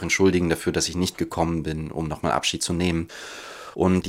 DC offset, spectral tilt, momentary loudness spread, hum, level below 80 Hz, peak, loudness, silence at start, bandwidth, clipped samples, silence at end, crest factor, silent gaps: under 0.1%; -4.5 dB/octave; 15 LU; none; -48 dBFS; -6 dBFS; -24 LUFS; 0 s; 16 kHz; under 0.1%; 0 s; 18 dB; none